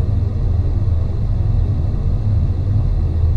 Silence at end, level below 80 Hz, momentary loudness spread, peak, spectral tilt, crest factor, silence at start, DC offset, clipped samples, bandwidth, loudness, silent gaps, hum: 0 s; -20 dBFS; 2 LU; -6 dBFS; -10 dB/octave; 10 dB; 0 s; under 0.1%; under 0.1%; 4.7 kHz; -19 LUFS; none; none